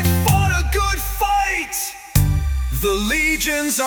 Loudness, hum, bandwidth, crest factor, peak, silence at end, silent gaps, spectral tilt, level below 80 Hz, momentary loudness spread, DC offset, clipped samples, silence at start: -19 LUFS; none; 19.5 kHz; 18 dB; -2 dBFS; 0 s; none; -4 dB/octave; -26 dBFS; 5 LU; under 0.1%; under 0.1%; 0 s